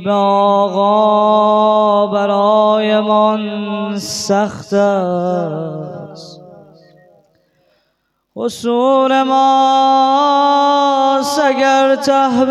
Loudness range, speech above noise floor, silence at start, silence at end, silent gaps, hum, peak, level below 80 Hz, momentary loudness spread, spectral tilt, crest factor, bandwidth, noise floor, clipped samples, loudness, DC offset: 11 LU; 53 dB; 0 s; 0 s; none; none; -2 dBFS; -62 dBFS; 9 LU; -5 dB/octave; 12 dB; 13.5 kHz; -66 dBFS; under 0.1%; -13 LUFS; under 0.1%